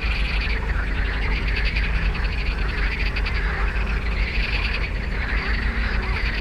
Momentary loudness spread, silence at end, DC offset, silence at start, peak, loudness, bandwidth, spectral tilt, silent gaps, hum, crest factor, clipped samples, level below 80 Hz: 2 LU; 0 s; under 0.1%; 0 s; -10 dBFS; -24 LUFS; 6.8 kHz; -6 dB/octave; none; none; 12 dB; under 0.1%; -24 dBFS